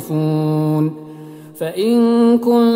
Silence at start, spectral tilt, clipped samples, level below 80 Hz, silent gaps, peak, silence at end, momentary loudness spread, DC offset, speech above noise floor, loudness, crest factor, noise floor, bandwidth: 0 s; -8 dB/octave; under 0.1%; -68 dBFS; none; -4 dBFS; 0 s; 22 LU; under 0.1%; 21 dB; -16 LUFS; 12 dB; -35 dBFS; 16 kHz